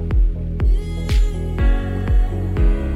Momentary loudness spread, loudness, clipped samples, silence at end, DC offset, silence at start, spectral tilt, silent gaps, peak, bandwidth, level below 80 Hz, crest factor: 3 LU; -21 LUFS; under 0.1%; 0 s; under 0.1%; 0 s; -7.5 dB/octave; none; -6 dBFS; 7.6 kHz; -18 dBFS; 10 dB